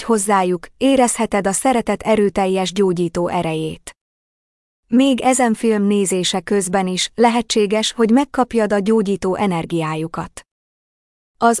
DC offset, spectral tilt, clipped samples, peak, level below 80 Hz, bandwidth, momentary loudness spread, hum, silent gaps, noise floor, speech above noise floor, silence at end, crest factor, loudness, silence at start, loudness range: under 0.1%; -4.5 dB/octave; under 0.1%; -4 dBFS; -48 dBFS; 12 kHz; 7 LU; none; 4.01-4.83 s, 10.51-11.34 s; under -90 dBFS; over 73 dB; 0 s; 14 dB; -17 LUFS; 0 s; 3 LU